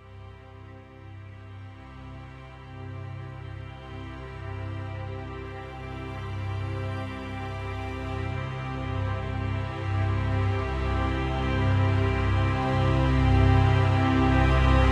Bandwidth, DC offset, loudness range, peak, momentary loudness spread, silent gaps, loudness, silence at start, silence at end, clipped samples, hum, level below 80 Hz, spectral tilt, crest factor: 8 kHz; under 0.1%; 18 LU; -8 dBFS; 22 LU; none; -27 LUFS; 0 s; 0 s; under 0.1%; none; -32 dBFS; -7.5 dB/octave; 18 dB